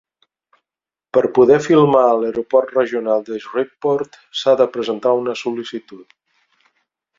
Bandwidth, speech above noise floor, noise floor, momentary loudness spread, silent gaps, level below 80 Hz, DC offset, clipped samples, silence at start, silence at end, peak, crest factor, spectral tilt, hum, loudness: 7.6 kHz; 73 dB; -89 dBFS; 12 LU; none; -62 dBFS; under 0.1%; under 0.1%; 1.15 s; 1.15 s; 0 dBFS; 18 dB; -6 dB/octave; none; -17 LUFS